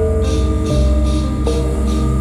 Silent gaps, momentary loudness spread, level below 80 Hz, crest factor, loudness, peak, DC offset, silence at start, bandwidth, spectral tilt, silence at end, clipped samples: none; 2 LU; -16 dBFS; 12 dB; -17 LUFS; -4 dBFS; under 0.1%; 0 s; 11.5 kHz; -7 dB/octave; 0 s; under 0.1%